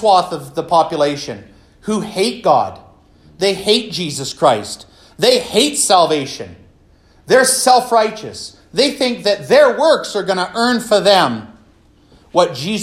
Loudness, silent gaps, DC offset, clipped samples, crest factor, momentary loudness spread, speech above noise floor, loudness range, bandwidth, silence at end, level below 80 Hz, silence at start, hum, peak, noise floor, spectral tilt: -14 LUFS; none; under 0.1%; under 0.1%; 16 dB; 15 LU; 35 dB; 4 LU; 16 kHz; 0 s; -54 dBFS; 0 s; none; 0 dBFS; -49 dBFS; -3 dB/octave